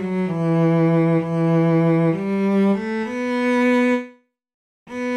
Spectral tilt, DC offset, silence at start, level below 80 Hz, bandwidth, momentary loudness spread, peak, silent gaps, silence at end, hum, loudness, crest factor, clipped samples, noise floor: -8.5 dB/octave; under 0.1%; 0 s; -60 dBFS; 9.2 kHz; 8 LU; -8 dBFS; 4.54-4.86 s; 0 s; none; -19 LUFS; 10 dB; under 0.1%; -46 dBFS